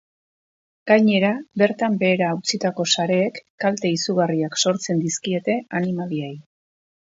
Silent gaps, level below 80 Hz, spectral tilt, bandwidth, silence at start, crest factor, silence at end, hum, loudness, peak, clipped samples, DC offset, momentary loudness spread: 3.50-3.58 s; -70 dBFS; -4.5 dB/octave; 8 kHz; 0.85 s; 20 dB; 0.6 s; none; -21 LUFS; -2 dBFS; under 0.1%; under 0.1%; 8 LU